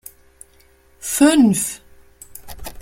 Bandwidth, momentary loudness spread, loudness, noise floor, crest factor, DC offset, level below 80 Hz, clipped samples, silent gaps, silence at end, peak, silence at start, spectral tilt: 16.5 kHz; 26 LU; -16 LUFS; -53 dBFS; 18 dB; under 0.1%; -46 dBFS; under 0.1%; none; 0 s; -2 dBFS; 1.05 s; -4 dB/octave